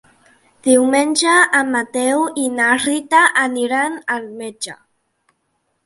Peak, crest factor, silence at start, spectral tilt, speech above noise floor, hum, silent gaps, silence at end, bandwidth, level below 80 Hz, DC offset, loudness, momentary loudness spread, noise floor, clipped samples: 0 dBFS; 18 dB; 0.65 s; -1.5 dB/octave; 52 dB; none; none; 1.1 s; 11.5 kHz; -66 dBFS; under 0.1%; -15 LUFS; 14 LU; -68 dBFS; under 0.1%